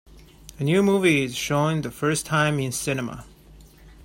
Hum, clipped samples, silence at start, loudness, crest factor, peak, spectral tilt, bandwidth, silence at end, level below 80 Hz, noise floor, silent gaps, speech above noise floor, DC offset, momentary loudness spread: none; under 0.1%; 0.15 s; -23 LUFS; 18 dB; -6 dBFS; -5 dB/octave; 16.5 kHz; 0.1 s; -50 dBFS; -49 dBFS; none; 26 dB; under 0.1%; 10 LU